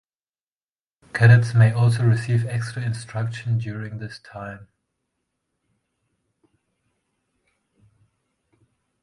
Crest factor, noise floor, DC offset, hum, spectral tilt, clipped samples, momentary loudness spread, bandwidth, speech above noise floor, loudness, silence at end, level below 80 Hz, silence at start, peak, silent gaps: 22 dB; under -90 dBFS; under 0.1%; none; -7 dB/octave; under 0.1%; 21 LU; 11.5 kHz; over 70 dB; -20 LUFS; 4.4 s; -56 dBFS; 1.15 s; -2 dBFS; none